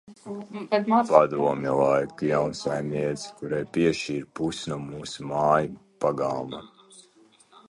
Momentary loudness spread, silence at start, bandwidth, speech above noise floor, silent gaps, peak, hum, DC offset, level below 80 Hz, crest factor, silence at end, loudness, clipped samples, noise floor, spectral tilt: 15 LU; 0.1 s; 11.5 kHz; 33 dB; none; -2 dBFS; none; under 0.1%; -60 dBFS; 24 dB; 0.65 s; -25 LUFS; under 0.1%; -58 dBFS; -6 dB/octave